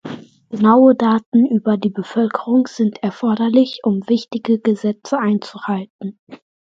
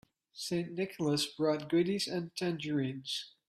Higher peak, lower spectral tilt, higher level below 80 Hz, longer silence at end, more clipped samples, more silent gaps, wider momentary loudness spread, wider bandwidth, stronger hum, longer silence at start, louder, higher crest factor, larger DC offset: first, 0 dBFS vs -18 dBFS; first, -7.5 dB/octave vs -5 dB/octave; first, -66 dBFS vs -74 dBFS; first, 0.4 s vs 0.2 s; neither; first, 1.26-1.32 s, 5.90-5.99 s, 6.19-6.27 s vs none; first, 12 LU vs 7 LU; second, 7.6 kHz vs 14.5 kHz; neither; second, 0.05 s vs 0.35 s; first, -17 LUFS vs -34 LUFS; about the same, 16 dB vs 16 dB; neither